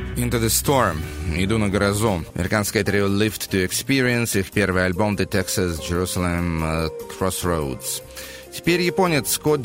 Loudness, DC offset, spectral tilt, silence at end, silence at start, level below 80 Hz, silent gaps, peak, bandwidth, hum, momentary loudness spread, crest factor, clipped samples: -21 LUFS; under 0.1%; -4.5 dB/octave; 0 s; 0 s; -38 dBFS; none; -4 dBFS; 16.5 kHz; none; 7 LU; 18 dB; under 0.1%